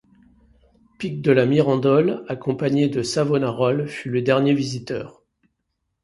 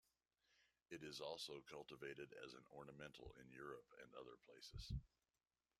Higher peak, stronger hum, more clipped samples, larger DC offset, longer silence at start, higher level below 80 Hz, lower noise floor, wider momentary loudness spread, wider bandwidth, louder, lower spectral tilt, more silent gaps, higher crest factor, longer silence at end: first, -2 dBFS vs -36 dBFS; neither; neither; neither; first, 1 s vs 0.5 s; first, -58 dBFS vs -66 dBFS; second, -76 dBFS vs under -90 dBFS; first, 12 LU vs 9 LU; second, 11.5 kHz vs 13.5 kHz; first, -21 LUFS vs -57 LUFS; first, -6.5 dB/octave vs -4.5 dB/octave; neither; about the same, 18 dB vs 22 dB; first, 0.95 s vs 0.75 s